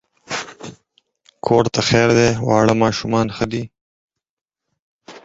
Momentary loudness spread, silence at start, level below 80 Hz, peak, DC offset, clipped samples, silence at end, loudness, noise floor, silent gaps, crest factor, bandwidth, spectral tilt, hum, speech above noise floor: 18 LU; 0.3 s; -46 dBFS; 0 dBFS; under 0.1%; under 0.1%; 0.05 s; -17 LUFS; -62 dBFS; 3.81-4.09 s, 4.29-4.46 s, 4.82-4.99 s; 18 dB; 8 kHz; -5 dB/octave; none; 47 dB